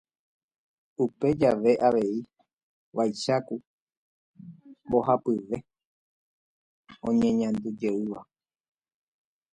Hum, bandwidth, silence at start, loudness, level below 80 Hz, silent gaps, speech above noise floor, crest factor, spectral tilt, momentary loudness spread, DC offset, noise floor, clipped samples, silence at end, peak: none; 10 kHz; 1 s; -27 LUFS; -62 dBFS; 2.53-2.57 s, 2.63-2.92 s, 3.67-3.87 s, 3.97-4.34 s, 5.85-6.83 s; 23 dB; 20 dB; -6.5 dB/octave; 14 LU; under 0.1%; -48 dBFS; under 0.1%; 1.3 s; -8 dBFS